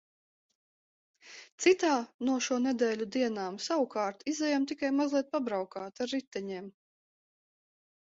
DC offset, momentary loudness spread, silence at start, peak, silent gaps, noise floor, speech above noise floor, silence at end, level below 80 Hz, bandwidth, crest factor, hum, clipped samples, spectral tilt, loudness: under 0.1%; 13 LU; 1.25 s; -14 dBFS; 1.52-1.58 s, 2.14-2.19 s, 6.27-6.31 s; under -90 dBFS; over 59 dB; 1.4 s; -78 dBFS; 8 kHz; 20 dB; none; under 0.1%; -3.5 dB/octave; -31 LUFS